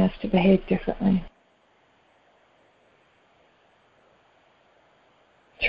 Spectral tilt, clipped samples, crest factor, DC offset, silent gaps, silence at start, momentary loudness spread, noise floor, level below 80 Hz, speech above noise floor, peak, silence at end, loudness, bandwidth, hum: -10 dB/octave; under 0.1%; 20 dB; under 0.1%; none; 0 s; 8 LU; -63 dBFS; -50 dBFS; 40 dB; -8 dBFS; 0 s; -23 LUFS; 5.4 kHz; none